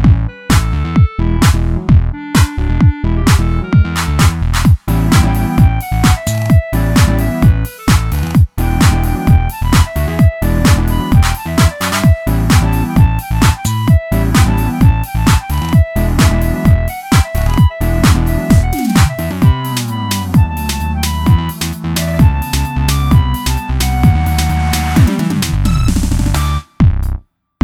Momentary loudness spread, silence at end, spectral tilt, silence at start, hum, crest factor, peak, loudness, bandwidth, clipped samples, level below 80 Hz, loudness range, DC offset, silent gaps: 4 LU; 0.45 s; -6 dB/octave; 0 s; none; 12 dB; 0 dBFS; -13 LUFS; 17.5 kHz; under 0.1%; -16 dBFS; 2 LU; under 0.1%; none